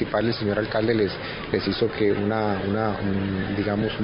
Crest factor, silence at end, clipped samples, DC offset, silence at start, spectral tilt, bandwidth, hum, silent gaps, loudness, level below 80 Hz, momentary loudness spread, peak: 16 dB; 0 s; under 0.1%; under 0.1%; 0 s; -11 dB/octave; 5.4 kHz; none; none; -24 LUFS; -44 dBFS; 4 LU; -8 dBFS